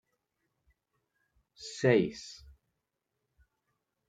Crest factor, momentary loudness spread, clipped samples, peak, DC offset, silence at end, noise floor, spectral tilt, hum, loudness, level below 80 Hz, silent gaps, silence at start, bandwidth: 26 dB; 21 LU; under 0.1%; -12 dBFS; under 0.1%; 1.75 s; -85 dBFS; -6 dB/octave; none; -29 LUFS; -66 dBFS; none; 1.6 s; 9.4 kHz